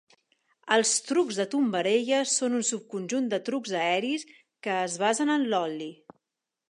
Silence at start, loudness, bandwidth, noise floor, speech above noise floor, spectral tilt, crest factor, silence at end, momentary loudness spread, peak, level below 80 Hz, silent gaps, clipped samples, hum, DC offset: 0.65 s; -27 LUFS; 11.5 kHz; -87 dBFS; 60 dB; -2.5 dB/octave; 20 dB; 0.8 s; 10 LU; -8 dBFS; -82 dBFS; none; under 0.1%; none; under 0.1%